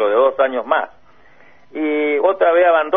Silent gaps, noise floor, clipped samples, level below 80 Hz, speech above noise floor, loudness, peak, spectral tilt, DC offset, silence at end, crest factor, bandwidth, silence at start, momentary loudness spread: none; -50 dBFS; under 0.1%; -62 dBFS; 35 dB; -16 LUFS; -2 dBFS; -6 dB/octave; 0.5%; 0 s; 14 dB; 3.8 kHz; 0 s; 11 LU